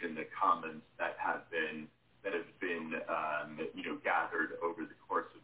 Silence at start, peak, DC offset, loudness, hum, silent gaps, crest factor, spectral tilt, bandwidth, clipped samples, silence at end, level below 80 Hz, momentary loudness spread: 0 s; -18 dBFS; under 0.1%; -37 LUFS; none; none; 20 dB; -2 dB/octave; 4 kHz; under 0.1%; 0.05 s; -78 dBFS; 10 LU